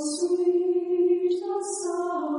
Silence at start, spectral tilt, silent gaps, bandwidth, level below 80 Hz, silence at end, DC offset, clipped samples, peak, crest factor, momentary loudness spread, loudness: 0 s; -3 dB/octave; none; 11 kHz; -78 dBFS; 0 s; under 0.1%; under 0.1%; -14 dBFS; 12 dB; 6 LU; -25 LUFS